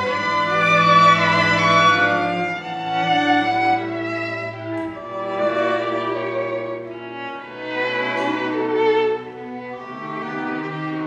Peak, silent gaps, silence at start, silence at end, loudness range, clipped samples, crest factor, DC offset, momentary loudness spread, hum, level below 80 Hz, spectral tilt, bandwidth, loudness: -4 dBFS; none; 0 s; 0 s; 8 LU; under 0.1%; 18 dB; under 0.1%; 17 LU; none; -64 dBFS; -5 dB/octave; 11 kHz; -19 LUFS